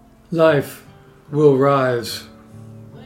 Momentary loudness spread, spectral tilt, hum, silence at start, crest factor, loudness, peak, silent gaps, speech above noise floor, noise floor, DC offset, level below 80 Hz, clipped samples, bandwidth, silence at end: 15 LU; -6.5 dB/octave; none; 0.3 s; 16 dB; -17 LUFS; -2 dBFS; none; 24 dB; -40 dBFS; under 0.1%; -58 dBFS; under 0.1%; 16 kHz; 0 s